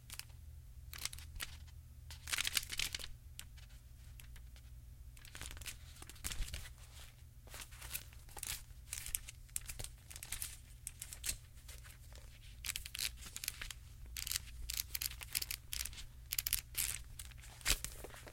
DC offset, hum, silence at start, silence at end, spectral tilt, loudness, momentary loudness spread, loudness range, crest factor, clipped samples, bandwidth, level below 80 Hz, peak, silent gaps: under 0.1%; none; 0 s; 0 s; -0.5 dB/octave; -43 LUFS; 19 LU; 10 LU; 34 dB; under 0.1%; 17 kHz; -54 dBFS; -12 dBFS; none